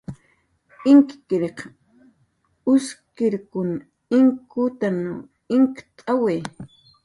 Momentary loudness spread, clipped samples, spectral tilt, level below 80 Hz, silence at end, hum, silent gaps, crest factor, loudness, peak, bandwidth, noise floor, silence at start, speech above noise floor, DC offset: 19 LU; under 0.1%; -7 dB/octave; -62 dBFS; 0.4 s; none; none; 18 dB; -21 LUFS; -4 dBFS; 11 kHz; -66 dBFS; 0.1 s; 46 dB; under 0.1%